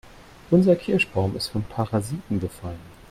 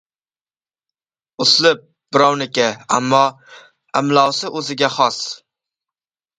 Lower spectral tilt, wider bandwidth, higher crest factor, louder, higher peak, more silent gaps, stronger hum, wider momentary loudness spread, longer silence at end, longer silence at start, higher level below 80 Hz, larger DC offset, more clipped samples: first, -6.5 dB/octave vs -3 dB/octave; first, 15 kHz vs 9.6 kHz; about the same, 18 dB vs 18 dB; second, -23 LUFS vs -16 LUFS; second, -6 dBFS vs 0 dBFS; neither; neither; first, 16 LU vs 11 LU; second, 0.2 s vs 1 s; second, 0.05 s vs 1.4 s; first, -48 dBFS vs -64 dBFS; neither; neither